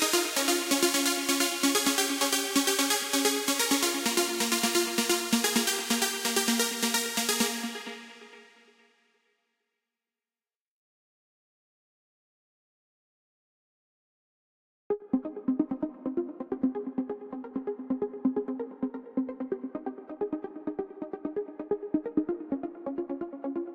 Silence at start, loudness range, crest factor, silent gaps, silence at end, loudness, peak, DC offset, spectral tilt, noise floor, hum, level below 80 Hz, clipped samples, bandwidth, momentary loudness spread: 0 s; 11 LU; 20 dB; 10.56-14.90 s; 0 s; -28 LUFS; -12 dBFS; under 0.1%; -1.5 dB/octave; under -90 dBFS; none; -70 dBFS; under 0.1%; 17 kHz; 12 LU